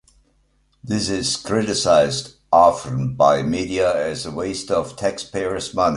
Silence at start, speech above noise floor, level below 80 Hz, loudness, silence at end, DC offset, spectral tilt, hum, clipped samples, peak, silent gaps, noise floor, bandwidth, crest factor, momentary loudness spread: 0.85 s; 43 dB; -48 dBFS; -20 LUFS; 0 s; under 0.1%; -4.5 dB/octave; none; under 0.1%; -2 dBFS; none; -62 dBFS; 11.5 kHz; 18 dB; 11 LU